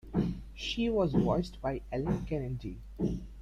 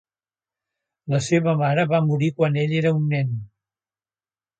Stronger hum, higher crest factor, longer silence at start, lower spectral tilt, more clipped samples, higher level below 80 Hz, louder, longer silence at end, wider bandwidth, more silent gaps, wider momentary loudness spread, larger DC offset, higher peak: neither; about the same, 18 dB vs 16 dB; second, 0.05 s vs 1.05 s; about the same, -7 dB/octave vs -7 dB/octave; neither; first, -44 dBFS vs -62 dBFS; second, -33 LUFS vs -21 LUFS; second, 0 s vs 1.15 s; about the same, 9.8 kHz vs 9 kHz; neither; first, 10 LU vs 7 LU; neither; second, -14 dBFS vs -6 dBFS